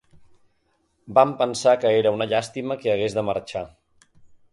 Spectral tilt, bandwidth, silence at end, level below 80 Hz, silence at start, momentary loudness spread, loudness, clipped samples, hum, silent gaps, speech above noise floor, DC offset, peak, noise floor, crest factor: -5 dB/octave; 11.5 kHz; 0.85 s; -60 dBFS; 1.05 s; 11 LU; -22 LUFS; under 0.1%; none; none; 47 dB; under 0.1%; -2 dBFS; -68 dBFS; 20 dB